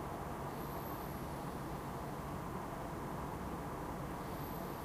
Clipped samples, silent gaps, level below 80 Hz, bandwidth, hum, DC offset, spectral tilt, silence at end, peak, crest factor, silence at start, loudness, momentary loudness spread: under 0.1%; none; -54 dBFS; 15.5 kHz; none; under 0.1%; -6 dB/octave; 0 s; -30 dBFS; 12 dB; 0 s; -44 LUFS; 1 LU